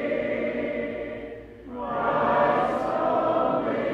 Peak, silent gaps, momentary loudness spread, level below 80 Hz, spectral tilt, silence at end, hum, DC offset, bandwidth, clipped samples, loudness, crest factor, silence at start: -10 dBFS; none; 15 LU; -54 dBFS; -7.5 dB/octave; 0 s; none; under 0.1%; 8.8 kHz; under 0.1%; -25 LUFS; 16 dB; 0 s